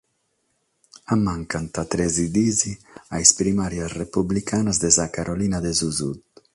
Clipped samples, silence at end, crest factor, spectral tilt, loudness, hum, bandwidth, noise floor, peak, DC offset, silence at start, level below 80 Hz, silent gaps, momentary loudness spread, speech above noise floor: under 0.1%; 0.35 s; 24 dB; -3.5 dB/octave; -21 LUFS; none; 11.5 kHz; -71 dBFS; 0 dBFS; under 0.1%; 1.1 s; -44 dBFS; none; 12 LU; 49 dB